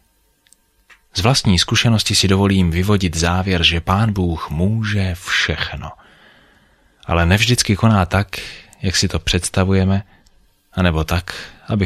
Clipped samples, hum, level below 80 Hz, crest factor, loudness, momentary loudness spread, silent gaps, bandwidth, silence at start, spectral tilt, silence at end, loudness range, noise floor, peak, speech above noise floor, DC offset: under 0.1%; none; -32 dBFS; 16 dB; -17 LUFS; 12 LU; none; 14 kHz; 1.15 s; -4.5 dB/octave; 0 s; 4 LU; -59 dBFS; -2 dBFS; 42 dB; under 0.1%